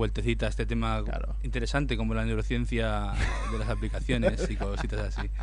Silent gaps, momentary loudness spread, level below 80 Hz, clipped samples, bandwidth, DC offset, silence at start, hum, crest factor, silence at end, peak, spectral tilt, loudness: none; 5 LU; -30 dBFS; under 0.1%; 10.5 kHz; under 0.1%; 0 s; none; 16 dB; 0 s; -12 dBFS; -6 dB/octave; -30 LUFS